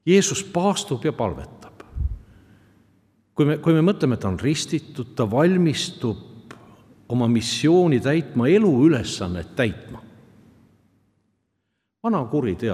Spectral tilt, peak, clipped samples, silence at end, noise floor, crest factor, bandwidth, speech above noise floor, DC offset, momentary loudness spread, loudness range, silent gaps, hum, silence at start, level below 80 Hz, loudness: -5.5 dB/octave; -4 dBFS; under 0.1%; 0 s; -76 dBFS; 18 dB; 14.5 kHz; 56 dB; under 0.1%; 14 LU; 8 LU; none; none; 0.05 s; -44 dBFS; -21 LUFS